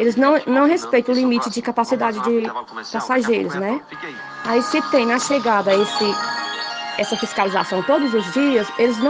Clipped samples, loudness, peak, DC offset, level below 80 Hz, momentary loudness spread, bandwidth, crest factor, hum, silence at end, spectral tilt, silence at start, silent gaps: under 0.1%; -19 LUFS; -2 dBFS; under 0.1%; -64 dBFS; 9 LU; 9.8 kHz; 16 dB; none; 0 s; -4 dB/octave; 0 s; none